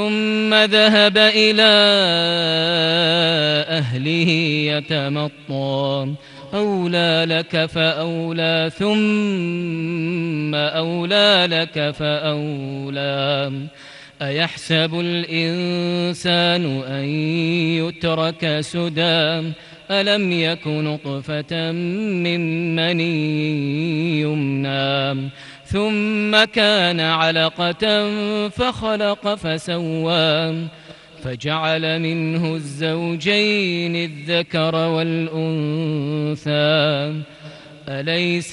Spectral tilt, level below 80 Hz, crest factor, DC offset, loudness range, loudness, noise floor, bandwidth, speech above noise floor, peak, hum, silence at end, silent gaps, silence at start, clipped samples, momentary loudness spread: -5.5 dB/octave; -54 dBFS; 18 dB; under 0.1%; 5 LU; -18 LUFS; -39 dBFS; 11.5 kHz; 20 dB; -2 dBFS; none; 0 s; none; 0 s; under 0.1%; 10 LU